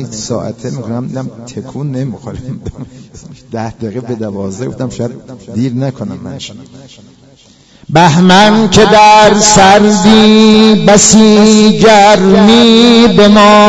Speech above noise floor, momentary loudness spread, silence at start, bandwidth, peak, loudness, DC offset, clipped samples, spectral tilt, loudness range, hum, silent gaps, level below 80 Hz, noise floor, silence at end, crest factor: 35 dB; 19 LU; 0 s; 11 kHz; 0 dBFS; -5 LUFS; under 0.1%; 3%; -4.5 dB/octave; 17 LU; none; none; -36 dBFS; -42 dBFS; 0 s; 8 dB